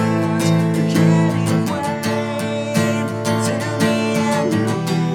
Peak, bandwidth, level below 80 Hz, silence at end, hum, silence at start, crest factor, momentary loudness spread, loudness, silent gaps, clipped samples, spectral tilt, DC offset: -4 dBFS; 16.5 kHz; -58 dBFS; 0 s; none; 0 s; 14 dB; 6 LU; -18 LUFS; none; under 0.1%; -6 dB/octave; 0.1%